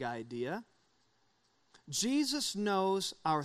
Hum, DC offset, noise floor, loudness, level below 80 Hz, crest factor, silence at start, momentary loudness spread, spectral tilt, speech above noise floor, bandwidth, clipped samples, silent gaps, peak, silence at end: none; under 0.1%; -74 dBFS; -34 LUFS; -74 dBFS; 16 dB; 0 s; 8 LU; -3.5 dB/octave; 40 dB; 15 kHz; under 0.1%; none; -18 dBFS; 0 s